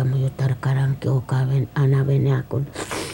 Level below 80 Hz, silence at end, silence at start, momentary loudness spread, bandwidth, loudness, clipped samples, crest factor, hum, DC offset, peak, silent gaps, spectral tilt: -48 dBFS; 0 s; 0 s; 8 LU; 16 kHz; -21 LUFS; under 0.1%; 12 dB; none; under 0.1%; -8 dBFS; none; -7 dB/octave